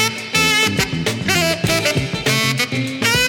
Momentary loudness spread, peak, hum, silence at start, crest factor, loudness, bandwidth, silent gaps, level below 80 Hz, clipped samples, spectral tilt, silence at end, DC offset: 5 LU; -2 dBFS; none; 0 s; 16 dB; -16 LUFS; 17 kHz; none; -42 dBFS; under 0.1%; -3 dB/octave; 0 s; under 0.1%